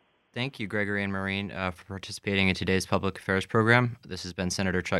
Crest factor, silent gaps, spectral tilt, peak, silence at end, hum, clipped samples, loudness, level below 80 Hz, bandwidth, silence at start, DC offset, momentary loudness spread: 24 dB; none; -5 dB/octave; -4 dBFS; 0 s; none; under 0.1%; -28 LUFS; -56 dBFS; 13.5 kHz; 0.35 s; under 0.1%; 13 LU